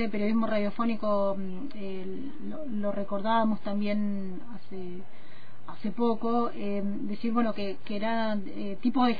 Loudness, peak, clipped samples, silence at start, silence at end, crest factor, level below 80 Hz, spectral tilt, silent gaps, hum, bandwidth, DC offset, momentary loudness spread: -31 LUFS; -12 dBFS; under 0.1%; 0 s; 0 s; 16 dB; -64 dBFS; -9 dB/octave; none; none; 5 kHz; 4%; 13 LU